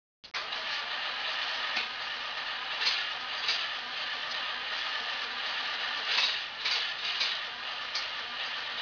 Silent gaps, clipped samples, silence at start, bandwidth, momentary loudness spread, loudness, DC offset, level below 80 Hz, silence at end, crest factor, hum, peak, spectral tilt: none; under 0.1%; 0.25 s; 5.4 kHz; 6 LU; -31 LUFS; under 0.1%; -72 dBFS; 0 s; 20 dB; none; -14 dBFS; 1 dB/octave